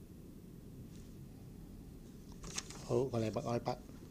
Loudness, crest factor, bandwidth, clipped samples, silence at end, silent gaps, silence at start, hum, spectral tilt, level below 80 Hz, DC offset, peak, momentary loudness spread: -40 LUFS; 22 dB; 15.5 kHz; under 0.1%; 0 s; none; 0 s; none; -5.5 dB/octave; -58 dBFS; under 0.1%; -22 dBFS; 17 LU